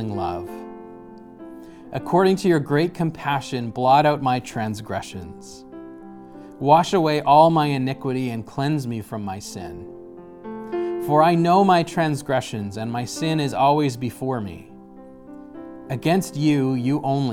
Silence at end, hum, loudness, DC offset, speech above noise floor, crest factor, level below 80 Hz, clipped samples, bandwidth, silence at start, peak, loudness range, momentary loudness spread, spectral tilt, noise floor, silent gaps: 0 s; none; -21 LUFS; under 0.1%; 22 dB; 20 dB; -56 dBFS; under 0.1%; 17 kHz; 0 s; -2 dBFS; 5 LU; 24 LU; -6.5 dB/octave; -43 dBFS; none